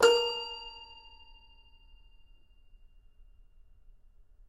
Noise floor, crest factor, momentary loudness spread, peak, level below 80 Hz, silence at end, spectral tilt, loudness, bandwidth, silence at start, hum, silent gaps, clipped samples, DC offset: -57 dBFS; 26 dB; 29 LU; -10 dBFS; -58 dBFS; 3.55 s; -1 dB/octave; -31 LUFS; 14 kHz; 0 s; none; none; under 0.1%; under 0.1%